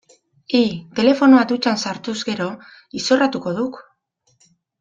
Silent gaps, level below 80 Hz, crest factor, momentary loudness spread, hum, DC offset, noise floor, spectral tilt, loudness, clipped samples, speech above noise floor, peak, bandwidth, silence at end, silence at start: none; -62 dBFS; 18 dB; 14 LU; none; under 0.1%; -65 dBFS; -4.5 dB/octave; -18 LUFS; under 0.1%; 47 dB; -2 dBFS; 7.8 kHz; 1 s; 0.5 s